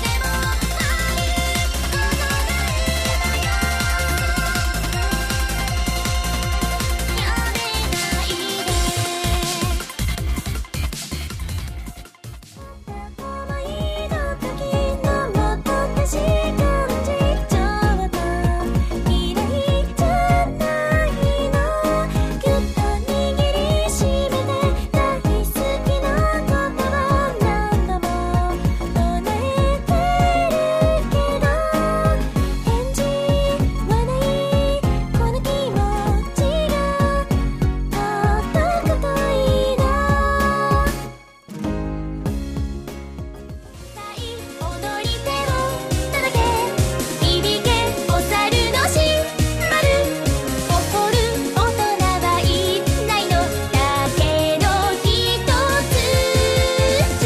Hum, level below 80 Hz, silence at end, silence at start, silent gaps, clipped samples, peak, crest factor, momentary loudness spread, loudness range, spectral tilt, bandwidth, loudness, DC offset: none; -26 dBFS; 0 s; 0 s; none; under 0.1%; -4 dBFS; 14 dB; 9 LU; 7 LU; -4.5 dB/octave; 15.5 kHz; -20 LUFS; under 0.1%